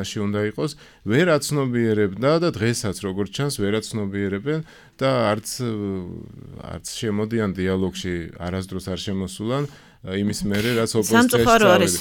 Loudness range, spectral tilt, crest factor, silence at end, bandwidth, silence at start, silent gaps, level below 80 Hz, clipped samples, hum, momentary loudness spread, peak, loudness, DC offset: 5 LU; -5 dB/octave; 20 dB; 0 s; 19 kHz; 0 s; none; -48 dBFS; under 0.1%; none; 14 LU; -2 dBFS; -22 LUFS; under 0.1%